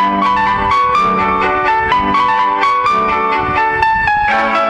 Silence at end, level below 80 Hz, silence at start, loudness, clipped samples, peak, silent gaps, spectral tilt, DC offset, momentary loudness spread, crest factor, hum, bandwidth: 0 s; -36 dBFS; 0 s; -12 LUFS; under 0.1%; 0 dBFS; none; -5 dB/octave; under 0.1%; 2 LU; 12 dB; none; 9.8 kHz